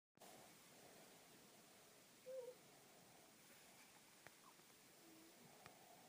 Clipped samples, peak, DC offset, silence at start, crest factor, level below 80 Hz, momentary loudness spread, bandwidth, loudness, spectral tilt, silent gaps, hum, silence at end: under 0.1%; -40 dBFS; under 0.1%; 0.15 s; 24 dB; under -90 dBFS; 9 LU; 15.5 kHz; -64 LUFS; -2.5 dB/octave; none; none; 0 s